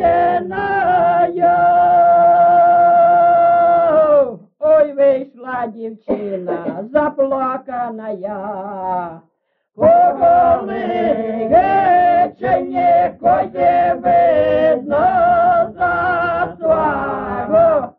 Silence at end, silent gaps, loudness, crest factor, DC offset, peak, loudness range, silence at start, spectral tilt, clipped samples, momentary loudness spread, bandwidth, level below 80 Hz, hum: 0.1 s; none; -14 LUFS; 12 dB; under 0.1%; -2 dBFS; 9 LU; 0 s; -5 dB/octave; under 0.1%; 13 LU; 4.3 kHz; -48 dBFS; none